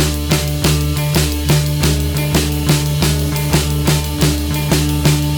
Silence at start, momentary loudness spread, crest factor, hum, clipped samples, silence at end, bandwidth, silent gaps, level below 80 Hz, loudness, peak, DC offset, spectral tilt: 0 s; 2 LU; 14 dB; none; under 0.1%; 0 s; over 20 kHz; none; -22 dBFS; -15 LUFS; 0 dBFS; under 0.1%; -4.5 dB/octave